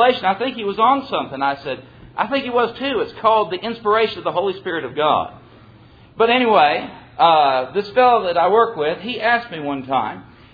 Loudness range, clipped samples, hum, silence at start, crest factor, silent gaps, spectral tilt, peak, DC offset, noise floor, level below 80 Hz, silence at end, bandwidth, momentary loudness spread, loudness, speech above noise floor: 4 LU; under 0.1%; none; 0 s; 18 dB; none; -7 dB/octave; 0 dBFS; under 0.1%; -46 dBFS; -56 dBFS; 0.3 s; 5 kHz; 11 LU; -18 LUFS; 28 dB